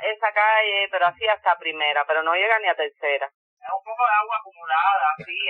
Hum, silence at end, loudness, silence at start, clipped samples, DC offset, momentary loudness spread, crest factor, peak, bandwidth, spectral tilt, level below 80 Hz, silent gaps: none; 0 s; -21 LUFS; 0 s; under 0.1%; under 0.1%; 11 LU; 16 dB; -6 dBFS; 4.5 kHz; -4 dB/octave; -74 dBFS; 3.34-3.57 s